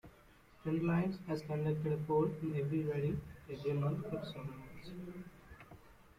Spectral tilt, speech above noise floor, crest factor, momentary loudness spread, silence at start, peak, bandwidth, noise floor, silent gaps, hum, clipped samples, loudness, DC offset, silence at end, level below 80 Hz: -9 dB/octave; 26 dB; 16 dB; 18 LU; 0.05 s; -22 dBFS; 15 kHz; -63 dBFS; none; none; under 0.1%; -38 LUFS; under 0.1%; 0.25 s; -64 dBFS